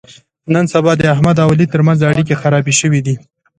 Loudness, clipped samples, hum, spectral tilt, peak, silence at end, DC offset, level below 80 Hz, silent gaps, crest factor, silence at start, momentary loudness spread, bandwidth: -12 LUFS; under 0.1%; none; -5.5 dB/octave; 0 dBFS; 0.4 s; under 0.1%; -44 dBFS; none; 12 dB; 0.45 s; 6 LU; 9.6 kHz